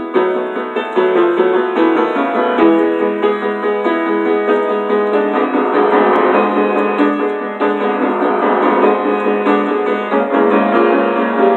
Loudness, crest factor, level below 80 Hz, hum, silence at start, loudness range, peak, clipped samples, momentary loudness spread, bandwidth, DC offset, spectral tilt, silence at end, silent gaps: -14 LUFS; 14 dB; -68 dBFS; none; 0 s; 1 LU; 0 dBFS; under 0.1%; 5 LU; 4.4 kHz; under 0.1%; -7.5 dB/octave; 0 s; none